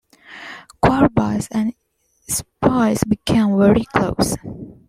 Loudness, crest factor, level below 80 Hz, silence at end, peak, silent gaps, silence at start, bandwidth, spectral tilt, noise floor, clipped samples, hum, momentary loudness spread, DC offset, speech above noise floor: -18 LUFS; 18 dB; -38 dBFS; 0.15 s; -2 dBFS; none; 0.3 s; 16 kHz; -5.5 dB/octave; -38 dBFS; under 0.1%; none; 20 LU; under 0.1%; 21 dB